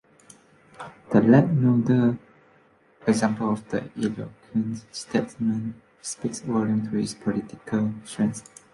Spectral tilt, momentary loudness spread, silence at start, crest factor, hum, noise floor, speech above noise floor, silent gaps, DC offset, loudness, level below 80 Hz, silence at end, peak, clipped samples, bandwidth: -7 dB/octave; 16 LU; 0.8 s; 22 dB; none; -59 dBFS; 35 dB; none; under 0.1%; -25 LUFS; -60 dBFS; 0.3 s; -4 dBFS; under 0.1%; 11.5 kHz